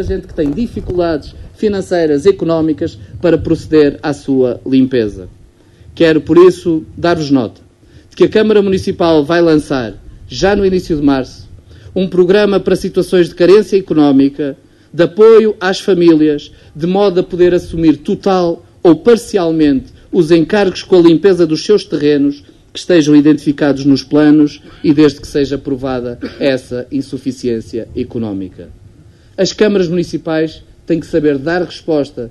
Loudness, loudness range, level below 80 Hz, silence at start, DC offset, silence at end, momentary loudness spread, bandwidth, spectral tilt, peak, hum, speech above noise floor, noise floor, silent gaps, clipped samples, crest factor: -12 LUFS; 6 LU; -38 dBFS; 0 s; under 0.1%; 0 s; 12 LU; 12 kHz; -6.5 dB/octave; 0 dBFS; none; 31 dB; -42 dBFS; none; 0.2%; 12 dB